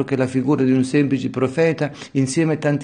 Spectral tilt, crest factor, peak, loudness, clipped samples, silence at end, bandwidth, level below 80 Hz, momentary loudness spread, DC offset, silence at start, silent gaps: -6.5 dB/octave; 14 dB; -6 dBFS; -19 LUFS; under 0.1%; 0 s; 10 kHz; -58 dBFS; 5 LU; under 0.1%; 0 s; none